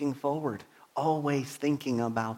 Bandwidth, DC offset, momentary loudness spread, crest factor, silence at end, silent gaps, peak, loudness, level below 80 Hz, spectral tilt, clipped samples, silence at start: 16.5 kHz; under 0.1%; 8 LU; 18 dB; 0 s; none; -14 dBFS; -31 LUFS; -72 dBFS; -6.5 dB/octave; under 0.1%; 0 s